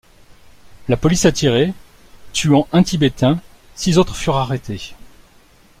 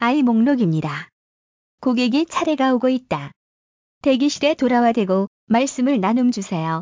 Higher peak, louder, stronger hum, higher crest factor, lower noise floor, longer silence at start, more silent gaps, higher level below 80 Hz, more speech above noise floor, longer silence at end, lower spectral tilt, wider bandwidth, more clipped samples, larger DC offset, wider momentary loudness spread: first, -2 dBFS vs -6 dBFS; about the same, -17 LUFS vs -19 LUFS; neither; about the same, 16 dB vs 14 dB; second, -49 dBFS vs under -90 dBFS; first, 0.7 s vs 0 s; second, none vs 1.13-1.78 s, 3.36-4.01 s, 5.27-5.47 s; first, -38 dBFS vs -60 dBFS; second, 34 dB vs over 72 dB; first, 0.75 s vs 0 s; about the same, -5.5 dB/octave vs -5.5 dB/octave; first, 15.5 kHz vs 7.6 kHz; neither; neither; first, 15 LU vs 8 LU